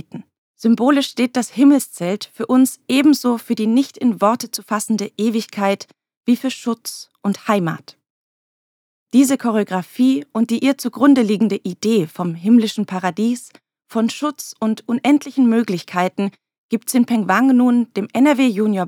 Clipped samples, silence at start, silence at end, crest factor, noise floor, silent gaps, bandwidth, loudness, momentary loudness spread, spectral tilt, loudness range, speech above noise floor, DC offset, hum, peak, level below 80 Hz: under 0.1%; 0.15 s; 0 s; 16 dB; under -90 dBFS; 0.38-0.54 s, 6.17-6.23 s, 8.10-9.06 s, 16.58-16.69 s; 17.5 kHz; -18 LUFS; 10 LU; -5 dB/octave; 5 LU; over 73 dB; under 0.1%; none; -2 dBFS; -80 dBFS